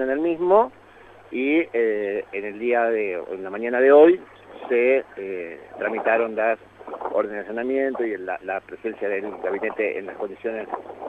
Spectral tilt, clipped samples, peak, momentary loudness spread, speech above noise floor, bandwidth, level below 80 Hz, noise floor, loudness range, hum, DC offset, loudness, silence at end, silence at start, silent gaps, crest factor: -7.5 dB/octave; under 0.1%; -4 dBFS; 13 LU; 26 dB; 4.1 kHz; -64 dBFS; -48 dBFS; 7 LU; none; under 0.1%; -23 LUFS; 0 s; 0 s; none; 20 dB